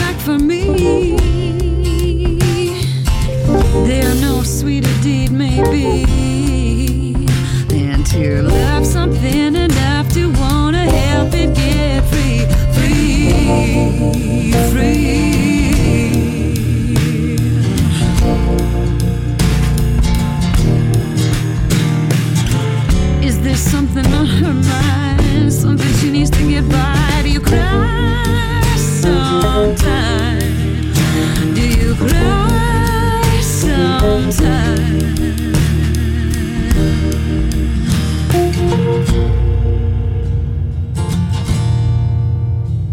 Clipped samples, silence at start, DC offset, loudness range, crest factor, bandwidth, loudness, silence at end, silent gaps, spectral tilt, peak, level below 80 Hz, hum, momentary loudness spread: under 0.1%; 0 s; under 0.1%; 2 LU; 12 dB; 17 kHz; -14 LUFS; 0 s; none; -6 dB/octave; -2 dBFS; -18 dBFS; none; 3 LU